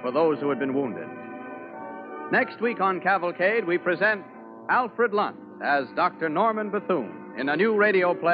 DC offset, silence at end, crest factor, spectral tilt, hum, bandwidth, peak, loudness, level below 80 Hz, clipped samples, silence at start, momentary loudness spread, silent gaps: under 0.1%; 0 s; 16 dB; -9.5 dB/octave; none; 5.2 kHz; -10 dBFS; -24 LUFS; -78 dBFS; under 0.1%; 0 s; 16 LU; none